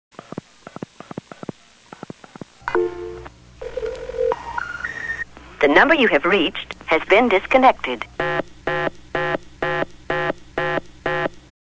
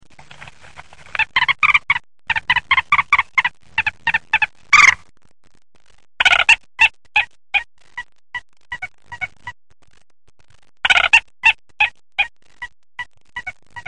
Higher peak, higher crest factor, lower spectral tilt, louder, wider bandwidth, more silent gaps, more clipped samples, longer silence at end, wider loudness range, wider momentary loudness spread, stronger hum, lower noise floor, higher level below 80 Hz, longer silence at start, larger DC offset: about the same, 0 dBFS vs 0 dBFS; about the same, 22 dB vs 20 dB; first, -5.5 dB/octave vs 0.5 dB/octave; second, -20 LUFS vs -15 LUFS; second, 8 kHz vs 11.5 kHz; neither; neither; first, 0.2 s vs 0.05 s; first, 13 LU vs 9 LU; about the same, 22 LU vs 22 LU; neither; about the same, -45 dBFS vs -43 dBFS; about the same, -48 dBFS vs -48 dBFS; first, 2.65 s vs 1.2 s; second, under 0.1% vs 0.7%